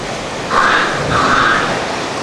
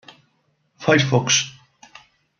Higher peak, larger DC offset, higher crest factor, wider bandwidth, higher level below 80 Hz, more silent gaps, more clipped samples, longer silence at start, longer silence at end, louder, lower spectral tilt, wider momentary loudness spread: about the same, 0 dBFS vs -2 dBFS; neither; second, 14 dB vs 20 dB; first, 13.5 kHz vs 7.2 kHz; first, -38 dBFS vs -62 dBFS; neither; neither; second, 0 s vs 0.8 s; second, 0 s vs 0.9 s; first, -14 LUFS vs -18 LUFS; about the same, -3.5 dB/octave vs -3.5 dB/octave; about the same, 8 LU vs 10 LU